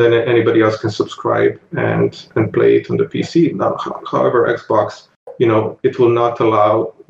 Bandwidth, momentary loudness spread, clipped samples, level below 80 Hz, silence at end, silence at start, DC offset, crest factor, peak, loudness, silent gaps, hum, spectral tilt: 7.6 kHz; 7 LU; under 0.1%; -58 dBFS; 0.2 s; 0 s; under 0.1%; 14 dB; -2 dBFS; -15 LUFS; 5.16-5.26 s; none; -7.5 dB/octave